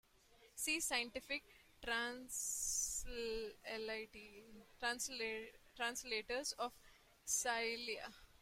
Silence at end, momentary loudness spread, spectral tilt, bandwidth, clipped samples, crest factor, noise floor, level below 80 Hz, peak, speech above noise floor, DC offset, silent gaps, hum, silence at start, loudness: 0.15 s; 15 LU; 0 dB/octave; 16 kHz; under 0.1%; 20 dB; -69 dBFS; -64 dBFS; -26 dBFS; 25 dB; under 0.1%; none; none; 0.3 s; -42 LUFS